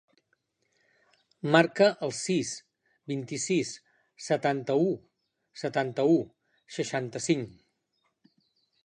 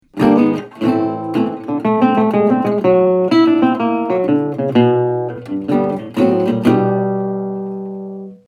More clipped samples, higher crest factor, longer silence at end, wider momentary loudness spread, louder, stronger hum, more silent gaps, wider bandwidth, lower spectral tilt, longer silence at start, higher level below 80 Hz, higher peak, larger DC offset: neither; first, 24 dB vs 14 dB; first, 1.35 s vs 0.1 s; first, 18 LU vs 11 LU; second, -28 LUFS vs -15 LUFS; neither; neither; about the same, 10.5 kHz vs 10.5 kHz; second, -5 dB/octave vs -8.5 dB/octave; first, 1.45 s vs 0.15 s; second, -74 dBFS vs -54 dBFS; second, -6 dBFS vs 0 dBFS; neither